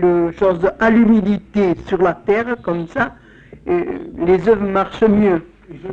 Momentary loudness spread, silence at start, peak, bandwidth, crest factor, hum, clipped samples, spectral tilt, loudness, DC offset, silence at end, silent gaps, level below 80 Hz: 9 LU; 0 s; -4 dBFS; 7.2 kHz; 12 dB; none; under 0.1%; -8.5 dB/octave; -16 LUFS; under 0.1%; 0 s; none; -42 dBFS